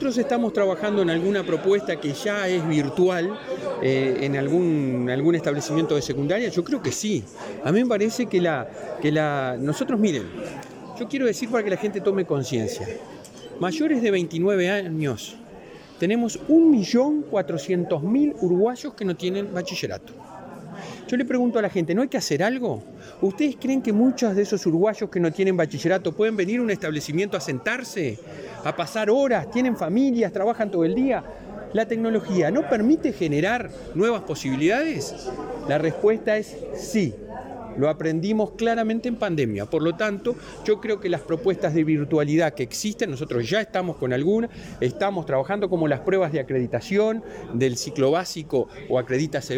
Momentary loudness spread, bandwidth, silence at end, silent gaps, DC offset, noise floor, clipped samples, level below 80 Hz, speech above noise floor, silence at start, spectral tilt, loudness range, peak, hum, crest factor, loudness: 10 LU; 16.5 kHz; 0 s; none; under 0.1%; -43 dBFS; under 0.1%; -56 dBFS; 20 dB; 0 s; -6 dB/octave; 3 LU; -8 dBFS; none; 16 dB; -23 LUFS